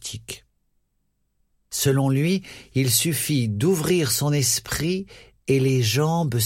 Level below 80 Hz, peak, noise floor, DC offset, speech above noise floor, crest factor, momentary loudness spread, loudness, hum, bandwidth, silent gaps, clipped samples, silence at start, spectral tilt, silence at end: -52 dBFS; -6 dBFS; -71 dBFS; under 0.1%; 49 dB; 16 dB; 13 LU; -22 LUFS; none; 16.5 kHz; none; under 0.1%; 0 s; -4.5 dB/octave; 0 s